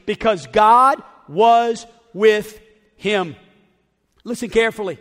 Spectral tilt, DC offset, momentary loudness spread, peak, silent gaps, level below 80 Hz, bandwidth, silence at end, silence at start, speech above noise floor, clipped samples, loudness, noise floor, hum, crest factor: -4.5 dB/octave; under 0.1%; 17 LU; -2 dBFS; none; -50 dBFS; 15.5 kHz; 0.05 s; 0.05 s; 47 dB; under 0.1%; -17 LUFS; -64 dBFS; none; 16 dB